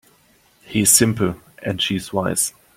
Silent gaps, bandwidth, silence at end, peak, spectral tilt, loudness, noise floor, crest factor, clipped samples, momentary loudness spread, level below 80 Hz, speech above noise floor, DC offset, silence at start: none; 16.5 kHz; 0.25 s; 0 dBFS; -3 dB/octave; -18 LUFS; -56 dBFS; 22 dB; under 0.1%; 13 LU; -52 dBFS; 38 dB; under 0.1%; 0.7 s